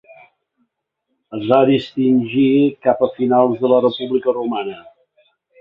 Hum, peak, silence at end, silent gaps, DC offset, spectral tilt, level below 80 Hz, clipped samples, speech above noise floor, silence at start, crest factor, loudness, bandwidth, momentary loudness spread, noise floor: none; -2 dBFS; 0.8 s; none; under 0.1%; -9 dB/octave; -62 dBFS; under 0.1%; 58 dB; 1.3 s; 16 dB; -16 LUFS; 5.4 kHz; 12 LU; -73 dBFS